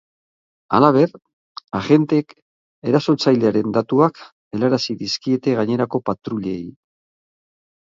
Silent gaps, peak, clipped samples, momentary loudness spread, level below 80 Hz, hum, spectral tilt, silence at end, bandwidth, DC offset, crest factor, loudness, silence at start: 1.33-1.55 s, 2.42-2.82 s, 4.32-4.51 s; 0 dBFS; under 0.1%; 14 LU; -58 dBFS; none; -6.5 dB/octave; 1.2 s; 7.6 kHz; under 0.1%; 20 dB; -19 LUFS; 0.7 s